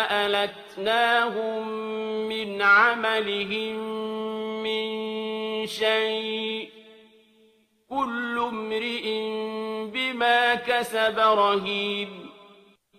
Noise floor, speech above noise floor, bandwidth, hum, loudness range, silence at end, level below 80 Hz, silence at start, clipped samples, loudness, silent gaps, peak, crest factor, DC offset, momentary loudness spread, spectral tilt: -61 dBFS; 37 dB; 14.5 kHz; none; 7 LU; 0.5 s; -70 dBFS; 0 s; under 0.1%; -25 LUFS; none; -6 dBFS; 20 dB; under 0.1%; 11 LU; -3.5 dB/octave